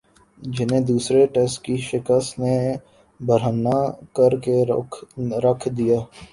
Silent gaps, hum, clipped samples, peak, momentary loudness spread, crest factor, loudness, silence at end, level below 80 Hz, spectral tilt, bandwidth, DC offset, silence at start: none; none; under 0.1%; -4 dBFS; 10 LU; 18 dB; -21 LUFS; 0.05 s; -54 dBFS; -6.5 dB/octave; 11.5 kHz; under 0.1%; 0.4 s